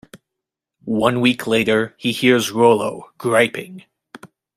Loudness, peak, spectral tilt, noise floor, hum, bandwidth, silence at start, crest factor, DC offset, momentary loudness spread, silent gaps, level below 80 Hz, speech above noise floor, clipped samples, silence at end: -17 LUFS; -2 dBFS; -4.5 dB/octave; -83 dBFS; none; 15.5 kHz; 0.15 s; 18 dB; under 0.1%; 12 LU; none; -58 dBFS; 66 dB; under 0.1%; 0.3 s